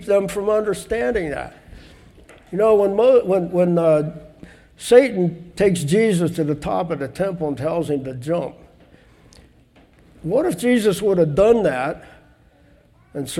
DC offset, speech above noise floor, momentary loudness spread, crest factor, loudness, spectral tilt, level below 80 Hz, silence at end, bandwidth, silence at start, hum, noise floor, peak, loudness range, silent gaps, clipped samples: under 0.1%; 35 dB; 15 LU; 20 dB; -19 LUFS; -6.5 dB/octave; -48 dBFS; 0 s; 15.5 kHz; 0 s; none; -53 dBFS; 0 dBFS; 8 LU; none; under 0.1%